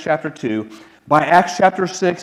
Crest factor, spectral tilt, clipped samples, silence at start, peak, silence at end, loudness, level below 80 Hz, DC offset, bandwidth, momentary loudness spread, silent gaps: 16 dB; -5 dB/octave; under 0.1%; 0 s; 0 dBFS; 0 s; -17 LUFS; -62 dBFS; under 0.1%; 12.5 kHz; 11 LU; none